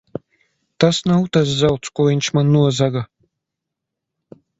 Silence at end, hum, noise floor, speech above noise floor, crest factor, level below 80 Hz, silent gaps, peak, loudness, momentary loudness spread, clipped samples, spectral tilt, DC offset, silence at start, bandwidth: 1.55 s; none; -81 dBFS; 65 dB; 18 dB; -50 dBFS; none; 0 dBFS; -17 LUFS; 14 LU; under 0.1%; -6 dB/octave; under 0.1%; 0.8 s; 8 kHz